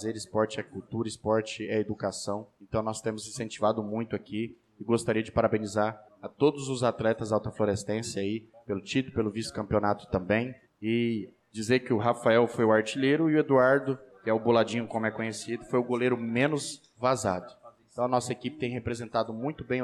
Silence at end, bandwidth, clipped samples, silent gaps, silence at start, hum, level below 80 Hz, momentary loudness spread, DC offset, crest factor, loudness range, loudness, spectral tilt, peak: 0 s; 13 kHz; under 0.1%; none; 0 s; none; -58 dBFS; 12 LU; under 0.1%; 16 dB; 6 LU; -29 LUFS; -5.5 dB/octave; -12 dBFS